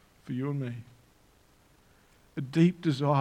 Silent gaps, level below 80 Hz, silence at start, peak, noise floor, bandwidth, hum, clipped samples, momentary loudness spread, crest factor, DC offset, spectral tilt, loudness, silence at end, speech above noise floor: none; -68 dBFS; 0.25 s; -12 dBFS; -62 dBFS; 9.6 kHz; none; under 0.1%; 16 LU; 20 dB; under 0.1%; -8 dB/octave; -29 LUFS; 0 s; 35 dB